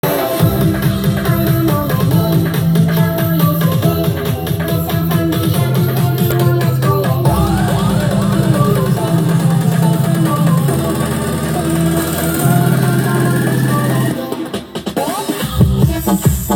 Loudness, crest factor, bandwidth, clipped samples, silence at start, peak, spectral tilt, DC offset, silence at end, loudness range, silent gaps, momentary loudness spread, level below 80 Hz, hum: -14 LUFS; 14 dB; 19.5 kHz; under 0.1%; 0.05 s; 0 dBFS; -6.5 dB/octave; under 0.1%; 0 s; 2 LU; none; 5 LU; -32 dBFS; none